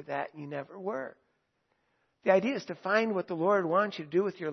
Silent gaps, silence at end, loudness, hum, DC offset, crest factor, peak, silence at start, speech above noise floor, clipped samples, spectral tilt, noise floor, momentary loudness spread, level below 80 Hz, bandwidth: none; 0 s; -30 LUFS; none; under 0.1%; 20 dB; -10 dBFS; 0 s; 46 dB; under 0.1%; -6.5 dB/octave; -77 dBFS; 12 LU; -84 dBFS; 6.4 kHz